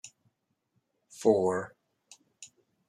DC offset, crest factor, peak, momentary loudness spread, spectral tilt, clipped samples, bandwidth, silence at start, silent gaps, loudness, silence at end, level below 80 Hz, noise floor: under 0.1%; 22 dB; -10 dBFS; 26 LU; -5.5 dB/octave; under 0.1%; 12.5 kHz; 0.05 s; none; -28 LUFS; 0.45 s; -80 dBFS; -77 dBFS